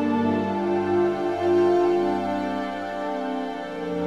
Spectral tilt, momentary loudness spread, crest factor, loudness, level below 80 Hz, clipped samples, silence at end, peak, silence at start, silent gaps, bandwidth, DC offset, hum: -7 dB/octave; 10 LU; 12 dB; -24 LUFS; -60 dBFS; under 0.1%; 0 s; -10 dBFS; 0 s; none; 8 kHz; 0.2%; none